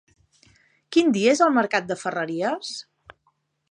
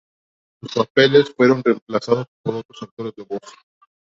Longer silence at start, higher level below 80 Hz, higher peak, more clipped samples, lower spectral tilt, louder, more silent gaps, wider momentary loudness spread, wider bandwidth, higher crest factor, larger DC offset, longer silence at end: first, 0.9 s vs 0.65 s; second, -70 dBFS vs -64 dBFS; about the same, -4 dBFS vs -2 dBFS; neither; second, -4 dB/octave vs -6 dB/octave; second, -22 LUFS vs -18 LUFS; second, none vs 0.90-0.95 s, 1.82-1.86 s, 2.28-2.44 s, 2.65-2.69 s, 2.91-2.97 s; second, 12 LU vs 18 LU; first, 11 kHz vs 7.8 kHz; about the same, 20 dB vs 18 dB; neither; first, 0.9 s vs 0.55 s